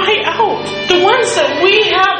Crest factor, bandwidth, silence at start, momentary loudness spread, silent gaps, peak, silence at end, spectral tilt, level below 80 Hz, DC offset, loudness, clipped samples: 12 dB; 9.8 kHz; 0 s; 6 LU; none; 0 dBFS; 0 s; -2.5 dB/octave; -48 dBFS; under 0.1%; -11 LUFS; under 0.1%